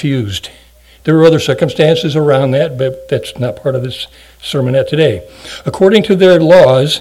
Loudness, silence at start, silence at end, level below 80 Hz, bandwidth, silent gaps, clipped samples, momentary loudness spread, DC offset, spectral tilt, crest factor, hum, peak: -11 LUFS; 0 s; 0 s; -44 dBFS; 14.5 kHz; none; 1%; 16 LU; under 0.1%; -6 dB/octave; 12 dB; none; 0 dBFS